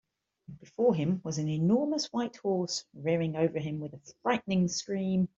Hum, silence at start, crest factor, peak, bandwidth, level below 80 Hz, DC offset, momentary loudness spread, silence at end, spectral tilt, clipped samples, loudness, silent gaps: none; 0.5 s; 16 dB; -14 dBFS; 7.8 kHz; -68 dBFS; under 0.1%; 8 LU; 0.1 s; -6 dB/octave; under 0.1%; -30 LUFS; none